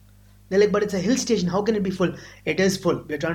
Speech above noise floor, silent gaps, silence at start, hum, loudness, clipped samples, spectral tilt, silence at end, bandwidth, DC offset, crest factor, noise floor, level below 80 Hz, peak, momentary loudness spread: 29 dB; none; 0.5 s; none; -23 LUFS; under 0.1%; -5 dB/octave; 0 s; 16 kHz; under 0.1%; 16 dB; -51 dBFS; -52 dBFS; -8 dBFS; 6 LU